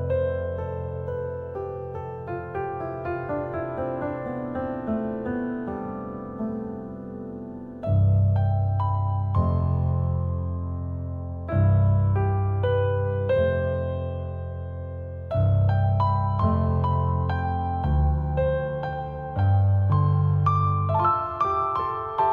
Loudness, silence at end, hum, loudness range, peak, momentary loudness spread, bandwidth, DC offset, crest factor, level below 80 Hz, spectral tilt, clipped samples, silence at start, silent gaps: -25 LUFS; 0 s; none; 8 LU; -10 dBFS; 12 LU; 4.3 kHz; under 0.1%; 14 dB; -40 dBFS; -11 dB/octave; under 0.1%; 0 s; none